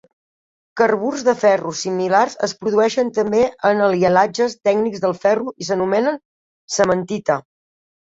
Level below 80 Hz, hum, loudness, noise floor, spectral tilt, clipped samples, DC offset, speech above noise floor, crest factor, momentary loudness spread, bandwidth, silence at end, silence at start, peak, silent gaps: -58 dBFS; none; -18 LUFS; under -90 dBFS; -4.5 dB/octave; under 0.1%; under 0.1%; over 73 dB; 18 dB; 7 LU; 8 kHz; 0.8 s; 0.75 s; -2 dBFS; 6.25-6.68 s